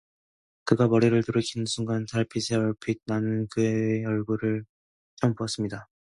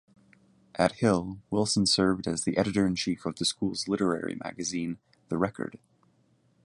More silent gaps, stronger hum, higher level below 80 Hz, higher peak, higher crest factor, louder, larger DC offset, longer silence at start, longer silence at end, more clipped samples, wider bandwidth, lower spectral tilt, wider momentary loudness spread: first, 4.69-5.17 s vs none; neither; about the same, -60 dBFS vs -56 dBFS; about the same, -6 dBFS vs -6 dBFS; about the same, 20 dB vs 22 dB; about the same, -27 LUFS vs -28 LUFS; neither; about the same, 0.65 s vs 0.75 s; second, 0.3 s vs 0.9 s; neither; about the same, 11.5 kHz vs 11.5 kHz; first, -6 dB/octave vs -4.5 dB/octave; second, 9 LU vs 12 LU